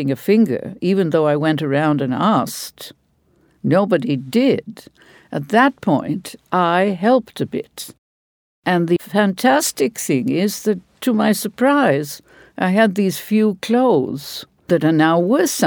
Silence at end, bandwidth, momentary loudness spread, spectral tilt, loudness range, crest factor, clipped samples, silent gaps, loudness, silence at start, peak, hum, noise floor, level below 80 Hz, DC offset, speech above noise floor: 0 s; over 20 kHz; 13 LU; -5.5 dB/octave; 2 LU; 16 dB; under 0.1%; 7.98-8.63 s; -17 LUFS; 0 s; -2 dBFS; none; -59 dBFS; -62 dBFS; under 0.1%; 42 dB